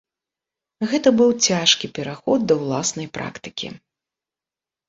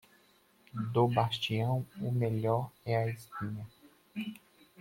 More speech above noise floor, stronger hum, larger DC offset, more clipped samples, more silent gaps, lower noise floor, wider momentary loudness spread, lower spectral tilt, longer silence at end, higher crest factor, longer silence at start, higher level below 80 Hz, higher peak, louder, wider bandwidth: first, 70 dB vs 34 dB; neither; neither; neither; neither; first, -90 dBFS vs -66 dBFS; about the same, 15 LU vs 16 LU; second, -3 dB/octave vs -7 dB/octave; first, 1.1 s vs 0.45 s; about the same, 22 dB vs 20 dB; about the same, 0.8 s vs 0.75 s; first, -62 dBFS vs -68 dBFS; first, -2 dBFS vs -14 dBFS; first, -19 LUFS vs -33 LUFS; second, 7.8 kHz vs 16.5 kHz